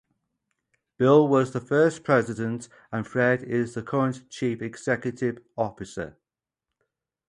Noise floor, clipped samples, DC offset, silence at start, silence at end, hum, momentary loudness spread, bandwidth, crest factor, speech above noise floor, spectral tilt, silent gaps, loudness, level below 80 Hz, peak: -89 dBFS; under 0.1%; under 0.1%; 1 s; 1.2 s; none; 15 LU; 11 kHz; 20 dB; 64 dB; -7 dB/octave; none; -25 LUFS; -62 dBFS; -6 dBFS